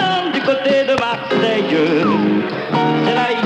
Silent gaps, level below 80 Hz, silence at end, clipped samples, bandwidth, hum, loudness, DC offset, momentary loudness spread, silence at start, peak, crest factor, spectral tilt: none; -58 dBFS; 0 s; under 0.1%; 9.4 kHz; none; -16 LUFS; under 0.1%; 3 LU; 0 s; -2 dBFS; 14 dB; -6 dB/octave